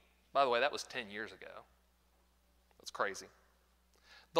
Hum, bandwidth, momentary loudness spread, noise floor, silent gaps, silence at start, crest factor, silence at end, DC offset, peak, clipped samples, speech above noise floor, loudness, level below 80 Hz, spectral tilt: none; 16 kHz; 21 LU; -72 dBFS; none; 0.35 s; 26 dB; 0 s; under 0.1%; -14 dBFS; under 0.1%; 35 dB; -37 LUFS; -74 dBFS; -2.5 dB/octave